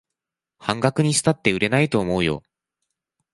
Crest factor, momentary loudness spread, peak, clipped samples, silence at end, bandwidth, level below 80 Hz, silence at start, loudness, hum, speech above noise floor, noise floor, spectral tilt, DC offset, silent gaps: 20 dB; 8 LU; -2 dBFS; under 0.1%; 0.95 s; 11.5 kHz; -50 dBFS; 0.6 s; -21 LUFS; none; 65 dB; -86 dBFS; -4.5 dB/octave; under 0.1%; none